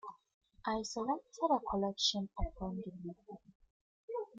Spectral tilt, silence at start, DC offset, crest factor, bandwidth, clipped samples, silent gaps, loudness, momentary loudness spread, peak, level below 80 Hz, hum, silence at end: -4 dB/octave; 0.05 s; under 0.1%; 20 dB; 9.4 kHz; under 0.1%; 0.34-0.41 s, 3.55-3.60 s, 3.70-4.08 s; -37 LUFS; 19 LU; -20 dBFS; -52 dBFS; none; 0 s